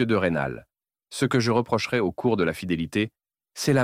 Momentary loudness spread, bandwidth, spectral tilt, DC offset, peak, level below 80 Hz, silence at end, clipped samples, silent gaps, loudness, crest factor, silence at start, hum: 9 LU; 16 kHz; -5.5 dB/octave; under 0.1%; -8 dBFS; -54 dBFS; 0 s; under 0.1%; none; -25 LUFS; 16 dB; 0 s; none